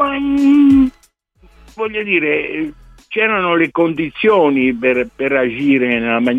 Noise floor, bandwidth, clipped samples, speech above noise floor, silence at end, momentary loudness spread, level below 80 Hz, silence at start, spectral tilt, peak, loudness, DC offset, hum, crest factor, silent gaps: -54 dBFS; 7.2 kHz; under 0.1%; 39 dB; 0 s; 11 LU; -44 dBFS; 0 s; -7 dB/octave; -2 dBFS; -14 LUFS; under 0.1%; none; 14 dB; none